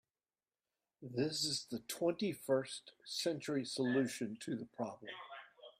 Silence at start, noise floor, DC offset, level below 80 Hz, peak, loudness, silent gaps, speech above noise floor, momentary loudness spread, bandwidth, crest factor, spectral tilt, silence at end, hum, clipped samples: 1 s; under -90 dBFS; under 0.1%; -82 dBFS; -22 dBFS; -39 LUFS; none; over 51 dB; 14 LU; 15.5 kHz; 18 dB; -4 dB/octave; 0.1 s; none; under 0.1%